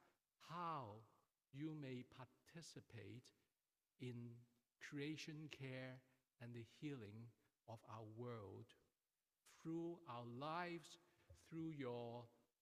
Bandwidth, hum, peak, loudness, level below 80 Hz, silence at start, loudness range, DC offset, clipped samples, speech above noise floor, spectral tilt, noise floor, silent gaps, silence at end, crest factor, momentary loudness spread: 15 kHz; none; -34 dBFS; -55 LUFS; under -90 dBFS; 0 s; 5 LU; under 0.1%; under 0.1%; over 36 dB; -6 dB/octave; under -90 dBFS; none; 0.25 s; 20 dB; 14 LU